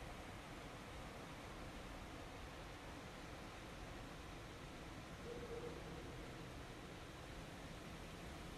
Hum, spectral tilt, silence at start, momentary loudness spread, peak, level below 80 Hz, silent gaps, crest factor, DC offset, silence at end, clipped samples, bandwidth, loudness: none; -4.5 dB/octave; 0 s; 3 LU; -36 dBFS; -60 dBFS; none; 16 dB; under 0.1%; 0 s; under 0.1%; 15 kHz; -53 LUFS